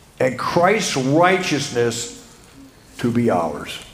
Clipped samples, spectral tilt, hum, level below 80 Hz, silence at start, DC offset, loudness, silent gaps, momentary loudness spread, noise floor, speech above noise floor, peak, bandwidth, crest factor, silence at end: under 0.1%; -4.5 dB/octave; none; -52 dBFS; 0.2 s; under 0.1%; -19 LUFS; none; 10 LU; -45 dBFS; 26 dB; 0 dBFS; 15.5 kHz; 20 dB; 0 s